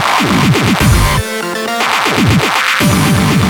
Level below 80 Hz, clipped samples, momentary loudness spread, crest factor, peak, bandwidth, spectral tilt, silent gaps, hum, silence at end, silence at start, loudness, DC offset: -24 dBFS; under 0.1%; 5 LU; 10 dB; 0 dBFS; over 20 kHz; -4.5 dB/octave; none; none; 0 s; 0 s; -11 LUFS; under 0.1%